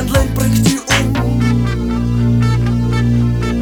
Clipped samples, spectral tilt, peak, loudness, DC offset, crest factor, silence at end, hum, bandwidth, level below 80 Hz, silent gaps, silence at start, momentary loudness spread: under 0.1%; -5.5 dB/octave; 0 dBFS; -14 LUFS; under 0.1%; 14 dB; 0 s; 60 Hz at -25 dBFS; 18 kHz; -22 dBFS; none; 0 s; 3 LU